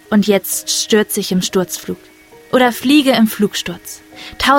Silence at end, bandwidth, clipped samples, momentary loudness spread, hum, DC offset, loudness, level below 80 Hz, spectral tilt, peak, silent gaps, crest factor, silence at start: 0 s; 17 kHz; under 0.1%; 18 LU; none; under 0.1%; -15 LUFS; -46 dBFS; -3.5 dB/octave; 0 dBFS; none; 16 dB; 0.1 s